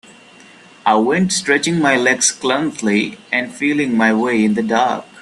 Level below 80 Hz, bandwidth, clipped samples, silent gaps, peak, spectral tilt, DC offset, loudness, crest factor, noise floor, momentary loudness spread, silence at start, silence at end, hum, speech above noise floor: -60 dBFS; 12.5 kHz; under 0.1%; none; 0 dBFS; -3.5 dB/octave; under 0.1%; -16 LUFS; 16 dB; -43 dBFS; 6 LU; 0.85 s; 0 s; none; 28 dB